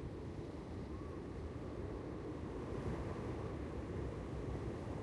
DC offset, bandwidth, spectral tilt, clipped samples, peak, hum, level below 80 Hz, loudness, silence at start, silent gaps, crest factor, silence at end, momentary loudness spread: under 0.1%; 11.5 kHz; -8 dB/octave; under 0.1%; -30 dBFS; none; -52 dBFS; -46 LUFS; 0 s; none; 14 dB; 0 s; 4 LU